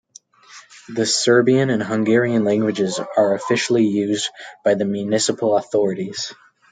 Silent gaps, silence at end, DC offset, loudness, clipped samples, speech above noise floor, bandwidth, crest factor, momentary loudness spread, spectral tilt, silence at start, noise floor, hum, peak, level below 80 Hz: none; 0.4 s; under 0.1%; -19 LUFS; under 0.1%; 29 dB; 9.6 kHz; 16 dB; 9 LU; -4.5 dB/octave; 0.5 s; -48 dBFS; none; -2 dBFS; -68 dBFS